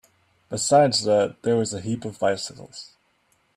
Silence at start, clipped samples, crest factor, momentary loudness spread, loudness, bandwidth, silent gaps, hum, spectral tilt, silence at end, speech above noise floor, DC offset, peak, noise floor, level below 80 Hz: 0.5 s; under 0.1%; 18 dB; 19 LU; -22 LUFS; 14.5 kHz; none; none; -4 dB/octave; 0.7 s; 44 dB; under 0.1%; -6 dBFS; -66 dBFS; -64 dBFS